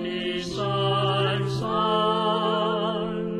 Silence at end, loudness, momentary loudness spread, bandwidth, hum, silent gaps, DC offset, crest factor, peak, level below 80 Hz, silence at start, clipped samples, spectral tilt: 0 s; -24 LUFS; 6 LU; 11.5 kHz; none; none; under 0.1%; 14 dB; -10 dBFS; -54 dBFS; 0 s; under 0.1%; -6 dB/octave